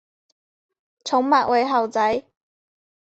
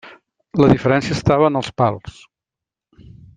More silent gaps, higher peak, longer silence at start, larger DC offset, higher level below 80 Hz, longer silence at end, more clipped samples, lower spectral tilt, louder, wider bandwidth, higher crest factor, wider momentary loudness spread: neither; second, -4 dBFS vs 0 dBFS; first, 1.05 s vs 0.05 s; neither; second, -64 dBFS vs -44 dBFS; second, 0.85 s vs 1.25 s; neither; second, -3.5 dB/octave vs -7 dB/octave; second, -20 LUFS vs -17 LUFS; second, 8.2 kHz vs 9.4 kHz; about the same, 18 dB vs 18 dB; about the same, 9 LU vs 8 LU